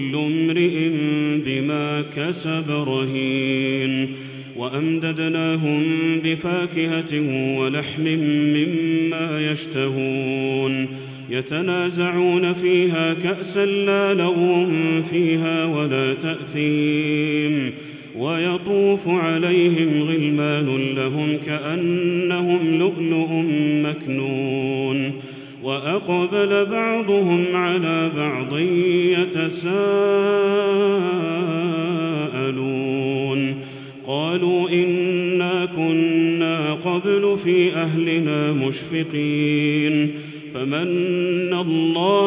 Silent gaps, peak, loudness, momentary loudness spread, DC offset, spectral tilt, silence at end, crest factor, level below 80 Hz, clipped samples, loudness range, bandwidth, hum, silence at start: none; -6 dBFS; -20 LUFS; 6 LU; under 0.1%; -11 dB/octave; 0 s; 14 dB; -66 dBFS; under 0.1%; 3 LU; 4 kHz; none; 0 s